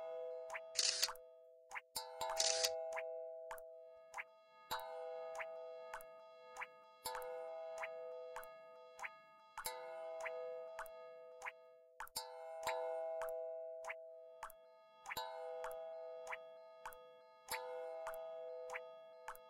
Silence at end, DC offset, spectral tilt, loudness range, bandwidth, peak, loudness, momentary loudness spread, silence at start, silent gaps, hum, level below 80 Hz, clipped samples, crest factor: 0 s; under 0.1%; 1.5 dB/octave; 9 LU; 16 kHz; -18 dBFS; -46 LUFS; 18 LU; 0 s; none; none; -78 dBFS; under 0.1%; 30 dB